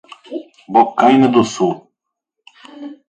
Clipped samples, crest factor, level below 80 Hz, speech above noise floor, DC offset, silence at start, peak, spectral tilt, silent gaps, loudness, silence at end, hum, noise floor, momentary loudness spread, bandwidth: under 0.1%; 16 dB; -60 dBFS; 66 dB; under 0.1%; 0.3 s; 0 dBFS; -5.5 dB/octave; none; -14 LUFS; 0.15 s; none; -78 dBFS; 19 LU; 9.2 kHz